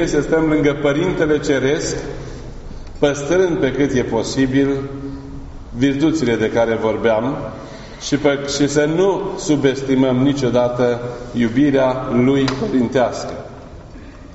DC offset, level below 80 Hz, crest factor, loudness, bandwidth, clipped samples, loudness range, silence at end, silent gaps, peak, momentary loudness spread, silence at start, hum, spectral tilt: under 0.1%; -38 dBFS; 16 dB; -17 LUFS; 8 kHz; under 0.1%; 2 LU; 0 s; none; 0 dBFS; 17 LU; 0 s; none; -5.5 dB/octave